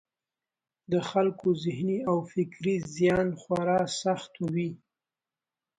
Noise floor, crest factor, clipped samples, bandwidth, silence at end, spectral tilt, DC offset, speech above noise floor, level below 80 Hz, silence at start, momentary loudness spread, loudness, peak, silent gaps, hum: under -90 dBFS; 18 dB; under 0.1%; 9.6 kHz; 1 s; -6 dB/octave; under 0.1%; over 62 dB; -62 dBFS; 0.9 s; 6 LU; -29 LUFS; -12 dBFS; none; none